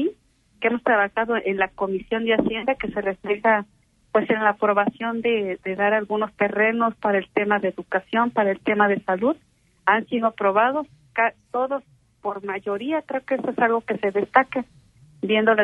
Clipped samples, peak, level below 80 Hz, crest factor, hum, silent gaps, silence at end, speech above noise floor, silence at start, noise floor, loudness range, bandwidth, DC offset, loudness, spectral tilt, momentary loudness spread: under 0.1%; 0 dBFS; -60 dBFS; 22 dB; none; none; 0 s; 36 dB; 0 s; -58 dBFS; 3 LU; 4.8 kHz; under 0.1%; -22 LUFS; -7.5 dB/octave; 8 LU